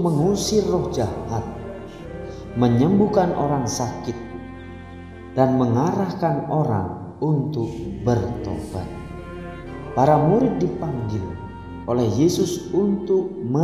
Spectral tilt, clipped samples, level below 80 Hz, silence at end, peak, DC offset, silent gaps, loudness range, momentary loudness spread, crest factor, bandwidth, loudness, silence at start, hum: -7 dB/octave; under 0.1%; -42 dBFS; 0 s; -2 dBFS; under 0.1%; none; 3 LU; 17 LU; 20 dB; 15 kHz; -22 LUFS; 0 s; none